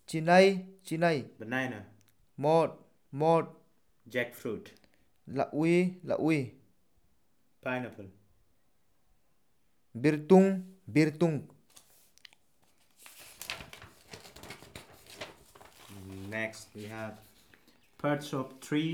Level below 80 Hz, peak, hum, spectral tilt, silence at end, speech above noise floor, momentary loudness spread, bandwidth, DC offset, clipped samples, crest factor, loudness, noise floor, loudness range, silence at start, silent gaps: -72 dBFS; -10 dBFS; none; -6.5 dB/octave; 0 s; 47 dB; 25 LU; 17.5 kHz; under 0.1%; under 0.1%; 24 dB; -30 LUFS; -76 dBFS; 17 LU; 0.1 s; none